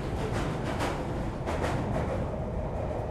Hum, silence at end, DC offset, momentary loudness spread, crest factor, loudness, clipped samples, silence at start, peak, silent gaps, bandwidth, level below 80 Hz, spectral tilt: none; 0 s; under 0.1%; 3 LU; 14 dB; -32 LUFS; under 0.1%; 0 s; -18 dBFS; none; 14 kHz; -38 dBFS; -6.5 dB/octave